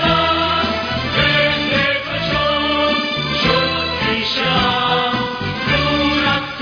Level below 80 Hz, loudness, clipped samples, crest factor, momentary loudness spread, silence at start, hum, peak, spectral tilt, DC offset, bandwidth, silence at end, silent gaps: -36 dBFS; -16 LUFS; under 0.1%; 14 dB; 4 LU; 0 s; none; -2 dBFS; -5.5 dB/octave; under 0.1%; 5.4 kHz; 0 s; none